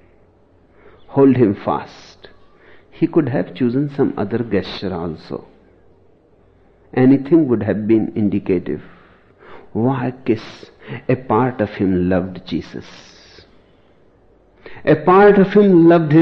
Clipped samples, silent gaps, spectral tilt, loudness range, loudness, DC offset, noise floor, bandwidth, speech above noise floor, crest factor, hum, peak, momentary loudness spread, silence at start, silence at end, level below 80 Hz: under 0.1%; none; -9.5 dB/octave; 6 LU; -16 LUFS; under 0.1%; -52 dBFS; 6.2 kHz; 37 dB; 16 dB; none; -2 dBFS; 17 LU; 1.1 s; 0 s; -50 dBFS